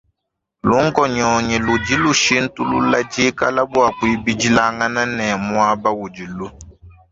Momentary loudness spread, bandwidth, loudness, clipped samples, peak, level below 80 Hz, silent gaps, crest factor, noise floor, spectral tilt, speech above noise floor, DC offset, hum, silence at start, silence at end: 8 LU; 7.8 kHz; -17 LUFS; under 0.1%; 0 dBFS; -44 dBFS; none; 16 dB; -78 dBFS; -4 dB/octave; 61 dB; under 0.1%; none; 0.65 s; 0.2 s